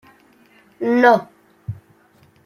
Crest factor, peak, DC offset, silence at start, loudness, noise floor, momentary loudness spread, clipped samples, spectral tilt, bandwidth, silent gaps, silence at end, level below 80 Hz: 20 dB; -2 dBFS; under 0.1%; 0.8 s; -16 LUFS; -54 dBFS; 23 LU; under 0.1%; -7 dB/octave; 13.5 kHz; none; 0.7 s; -62 dBFS